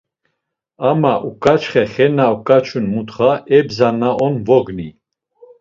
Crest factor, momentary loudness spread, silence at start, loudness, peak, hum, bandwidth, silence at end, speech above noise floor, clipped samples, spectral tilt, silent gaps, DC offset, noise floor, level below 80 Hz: 16 dB; 7 LU; 0.8 s; -15 LUFS; 0 dBFS; none; 7.6 kHz; 0.7 s; 60 dB; under 0.1%; -7.5 dB/octave; none; under 0.1%; -74 dBFS; -50 dBFS